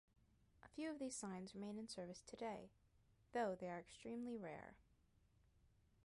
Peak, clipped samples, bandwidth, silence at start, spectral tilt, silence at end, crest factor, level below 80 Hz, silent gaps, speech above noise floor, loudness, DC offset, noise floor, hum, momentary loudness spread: -32 dBFS; under 0.1%; 11.5 kHz; 0.65 s; -4.5 dB/octave; 0.35 s; 20 dB; -78 dBFS; none; 27 dB; -51 LUFS; under 0.1%; -77 dBFS; none; 11 LU